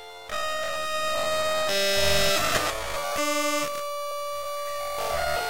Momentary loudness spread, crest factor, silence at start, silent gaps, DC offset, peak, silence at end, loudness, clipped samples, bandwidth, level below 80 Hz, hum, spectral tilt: 10 LU; 18 dB; 0 s; none; 1%; -8 dBFS; 0 s; -26 LUFS; under 0.1%; 17 kHz; -46 dBFS; none; -2 dB/octave